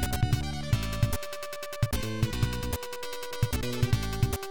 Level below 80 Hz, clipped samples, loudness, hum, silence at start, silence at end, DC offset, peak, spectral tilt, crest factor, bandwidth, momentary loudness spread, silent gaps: -38 dBFS; under 0.1%; -31 LUFS; none; 0 s; 0 s; 1%; -12 dBFS; -5 dB/octave; 18 dB; 19 kHz; 8 LU; none